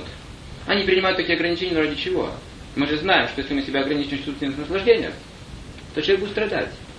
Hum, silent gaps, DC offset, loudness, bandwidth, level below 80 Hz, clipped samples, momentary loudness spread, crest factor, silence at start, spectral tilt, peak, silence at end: none; none; under 0.1%; -22 LUFS; 10.5 kHz; -44 dBFS; under 0.1%; 19 LU; 20 dB; 0 s; -5.5 dB/octave; -2 dBFS; 0 s